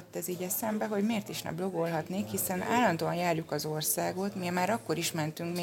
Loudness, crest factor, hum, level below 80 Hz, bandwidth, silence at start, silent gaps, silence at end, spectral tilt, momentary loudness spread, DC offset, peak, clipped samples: -31 LUFS; 18 dB; none; -70 dBFS; 17 kHz; 0 s; none; 0 s; -4.5 dB/octave; 6 LU; under 0.1%; -14 dBFS; under 0.1%